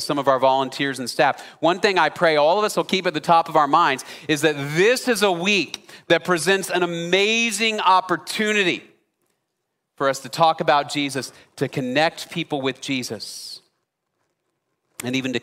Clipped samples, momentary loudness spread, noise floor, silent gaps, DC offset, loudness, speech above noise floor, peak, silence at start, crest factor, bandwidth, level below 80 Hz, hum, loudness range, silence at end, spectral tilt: under 0.1%; 11 LU; -77 dBFS; none; under 0.1%; -20 LUFS; 57 dB; -4 dBFS; 0 s; 18 dB; 16 kHz; -70 dBFS; none; 7 LU; 0.05 s; -3.5 dB/octave